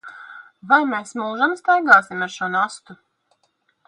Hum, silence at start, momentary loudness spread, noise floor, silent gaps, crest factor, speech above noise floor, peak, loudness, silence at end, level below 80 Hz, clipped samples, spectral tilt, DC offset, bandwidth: none; 0.05 s; 19 LU; -67 dBFS; none; 20 dB; 48 dB; 0 dBFS; -18 LUFS; 0.95 s; -74 dBFS; under 0.1%; -4 dB/octave; under 0.1%; 11 kHz